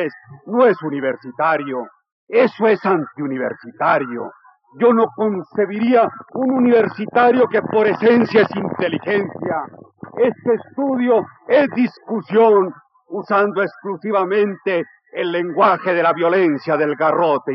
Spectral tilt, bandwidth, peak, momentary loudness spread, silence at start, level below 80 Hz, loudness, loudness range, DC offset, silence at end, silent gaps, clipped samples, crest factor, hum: -4.5 dB/octave; 5.8 kHz; -2 dBFS; 11 LU; 0 s; -84 dBFS; -17 LUFS; 3 LU; under 0.1%; 0 s; 2.12-2.27 s; under 0.1%; 14 dB; none